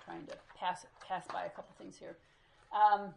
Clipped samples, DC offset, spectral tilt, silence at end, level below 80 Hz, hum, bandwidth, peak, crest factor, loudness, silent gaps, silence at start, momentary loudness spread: under 0.1%; under 0.1%; -4 dB/octave; 0 s; -74 dBFS; none; 11 kHz; -16 dBFS; 20 dB; -36 LUFS; none; 0 s; 23 LU